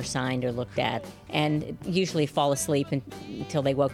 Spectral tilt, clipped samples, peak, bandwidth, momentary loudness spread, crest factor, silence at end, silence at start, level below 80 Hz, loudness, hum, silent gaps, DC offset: -5 dB/octave; under 0.1%; -10 dBFS; 16 kHz; 7 LU; 18 dB; 0 s; 0 s; -54 dBFS; -28 LUFS; none; none; under 0.1%